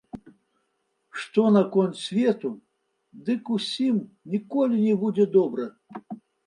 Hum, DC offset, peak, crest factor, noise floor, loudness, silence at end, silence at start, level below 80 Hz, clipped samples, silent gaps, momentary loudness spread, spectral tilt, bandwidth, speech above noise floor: none; under 0.1%; -6 dBFS; 18 dB; -74 dBFS; -24 LUFS; 0.3 s; 0.15 s; -72 dBFS; under 0.1%; none; 20 LU; -7 dB/octave; 11 kHz; 51 dB